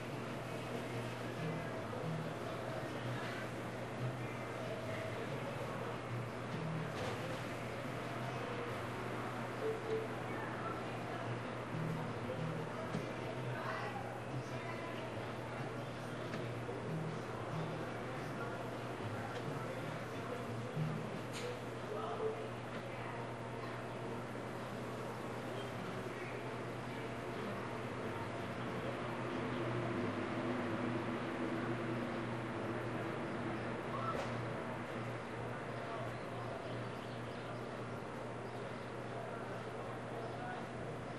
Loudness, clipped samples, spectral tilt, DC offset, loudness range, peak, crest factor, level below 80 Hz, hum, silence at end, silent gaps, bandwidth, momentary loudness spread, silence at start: -43 LUFS; under 0.1%; -6 dB/octave; under 0.1%; 4 LU; -26 dBFS; 16 dB; -66 dBFS; none; 0 s; none; 13 kHz; 5 LU; 0 s